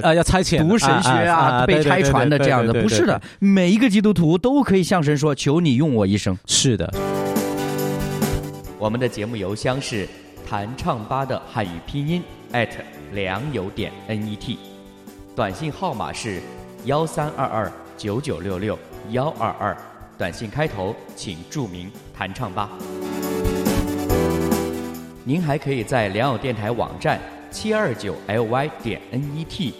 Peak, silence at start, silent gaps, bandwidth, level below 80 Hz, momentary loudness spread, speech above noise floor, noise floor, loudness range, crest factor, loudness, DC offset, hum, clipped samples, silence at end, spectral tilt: -2 dBFS; 0 s; none; 16 kHz; -40 dBFS; 14 LU; 21 dB; -41 dBFS; 11 LU; 18 dB; -21 LUFS; under 0.1%; none; under 0.1%; 0 s; -5.5 dB/octave